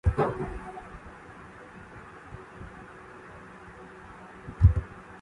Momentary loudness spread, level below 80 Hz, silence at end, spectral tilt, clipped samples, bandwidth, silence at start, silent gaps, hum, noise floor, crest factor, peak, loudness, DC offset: 23 LU; -36 dBFS; 0.05 s; -9 dB/octave; under 0.1%; 9.6 kHz; 0.05 s; none; none; -47 dBFS; 24 dB; -8 dBFS; -28 LUFS; under 0.1%